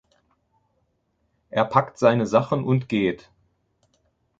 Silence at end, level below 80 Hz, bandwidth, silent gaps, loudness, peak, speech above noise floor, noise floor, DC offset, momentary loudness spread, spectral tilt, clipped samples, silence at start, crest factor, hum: 1.25 s; -60 dBFS; 7.8 kHz; none; -22 LUFS; -2 dBFS; 50 dB; -71 dBFS; under 0.1%; 8 LU; -7.5 dB/octave; under 0.1%; 1.55 s; 22 dB; none